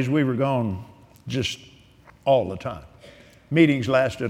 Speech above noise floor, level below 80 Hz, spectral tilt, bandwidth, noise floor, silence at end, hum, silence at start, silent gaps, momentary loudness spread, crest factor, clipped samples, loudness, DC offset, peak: 30 dB; -54 dBFS; -6.5 dB/octave; 14 kHz; -52 dBFS; 0 s; none; 0 s; none; 17 LU; 20 dB; under 0.1%; -23 LUFS; under 0.1%; -4 dBFS